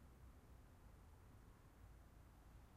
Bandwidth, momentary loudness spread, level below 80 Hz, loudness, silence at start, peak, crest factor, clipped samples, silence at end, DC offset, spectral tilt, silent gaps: 15.5 kHz; 1 LU; -66 dBFS; -67 LUFS; 0 s; -52 dBFS; 12 dB; under 0.1%; 0 s; under 0.1%; -6 dB/octave; none